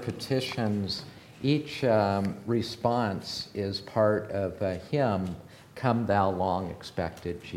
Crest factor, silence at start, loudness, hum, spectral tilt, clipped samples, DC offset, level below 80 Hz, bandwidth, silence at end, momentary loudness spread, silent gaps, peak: 20 dB; 0 s; -29 LUFS; none; -6.5 dB/octave; under 0.1%; under 0.1%; -58 dBFS; 16 kHz; 0 s; 9 LU; none; -10 dBFS